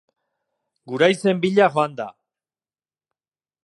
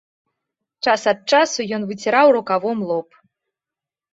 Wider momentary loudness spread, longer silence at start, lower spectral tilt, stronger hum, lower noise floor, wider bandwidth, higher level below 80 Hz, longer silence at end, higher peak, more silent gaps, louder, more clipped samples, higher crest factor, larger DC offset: first, 16 LU vs 10 LU; about the same, 0.85 s vs 0.85 s; first, -5.5 dB/octave vs -3.5 dB/octave; neither; about the same, under -90 dBFS vs -88 dBFS; first, 11.5 kHz vs 8 kHz; about the same, -72 dBFS vs -68 dBFS; first, 1.55 s vs 1.1 s; about the same, -2 dBFS vs -2 dBFS; neither; about the same, -19 LUFS vs -18 LUFS; neither; about the same, 20 dB vs 18 dB; neither